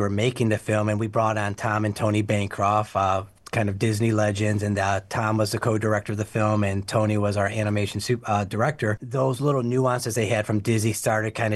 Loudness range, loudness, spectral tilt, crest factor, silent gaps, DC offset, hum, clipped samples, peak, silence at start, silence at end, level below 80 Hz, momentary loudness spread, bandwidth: 1 LU; -24 LUFS; -6 dB/octave; 14 dB; none; under 0.1%; none; under 0.1%; -8 dBFS; 0 s; 0 s; -58 dBFS; 3 LU; 12.5 kHz